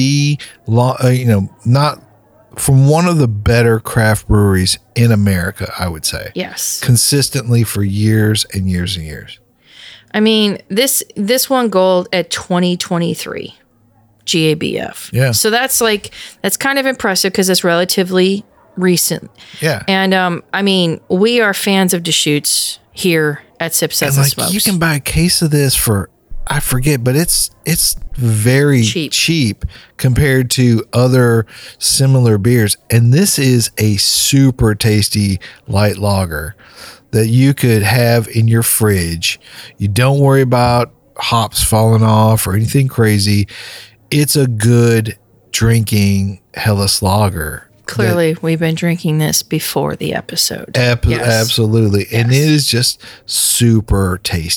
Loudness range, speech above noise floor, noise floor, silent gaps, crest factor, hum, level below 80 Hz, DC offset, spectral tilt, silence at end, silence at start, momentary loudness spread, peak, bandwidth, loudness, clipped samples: 3 LU; 38 dB; -51 dBFS; none; 12 dB; none; -34 dBFS; under 0.1%; -4.5 dB/octave; 0 s; 0 s; 9 LU; -2 dBFS; 19 kHz; -13 LUFS; under 0.1%